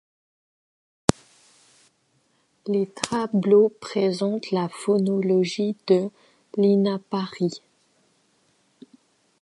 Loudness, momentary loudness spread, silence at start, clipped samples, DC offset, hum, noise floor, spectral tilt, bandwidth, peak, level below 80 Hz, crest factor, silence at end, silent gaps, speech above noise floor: -23 LUFS; 10 LU; 1.1 s; under 0.1%; under 0.1%; none; -67 dBFS; -6 dB/octave; 11.5 kHz; 0 dBFS; -54 dBFS; 24 dB; 1.85 s; none; 45 dB